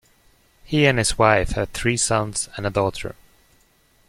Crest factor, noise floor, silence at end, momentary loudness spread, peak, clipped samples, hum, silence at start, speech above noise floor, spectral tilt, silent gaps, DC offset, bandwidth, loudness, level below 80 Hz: 20 dB; -59 dBFS; 0.95 s; 9 LU; -2 dBFS; under 0.1%; none; 0.7 s; 39 dB; -4 dB/octave; none; under 0.1%; 15.5 kHz; -20 LUFS; -38 dBFS